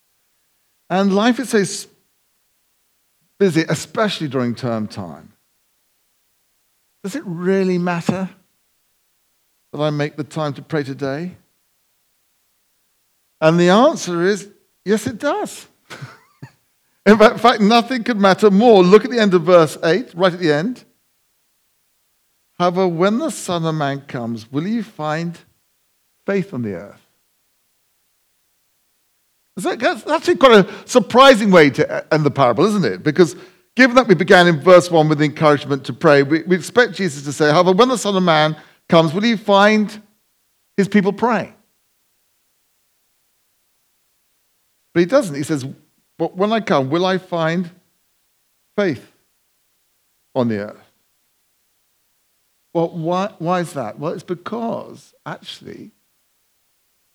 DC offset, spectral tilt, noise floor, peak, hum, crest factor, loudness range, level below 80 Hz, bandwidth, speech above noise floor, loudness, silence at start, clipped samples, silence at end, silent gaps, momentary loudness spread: under 0.1%; -5.5 dB/octave; -64 dBFS; 0 dBFS; none; 18 dB; 14 LU; -60 dBFS; 15.5 kHz; 48 dB; -16 LUFS; 0.9 s; under 0.1%; 1.25 s; none; 17 LU